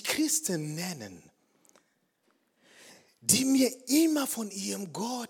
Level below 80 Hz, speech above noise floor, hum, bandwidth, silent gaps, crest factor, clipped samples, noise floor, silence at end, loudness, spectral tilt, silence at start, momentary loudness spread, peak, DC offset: -74 dBFS; 44 dB; none; 18 kHz; none; 22 dB; under 0.1%; -73 dBFS; 0.05 s; -28 LUFS; -3 dB/octave; 0 s; 12 LU; -8 dBFS; under 0.1%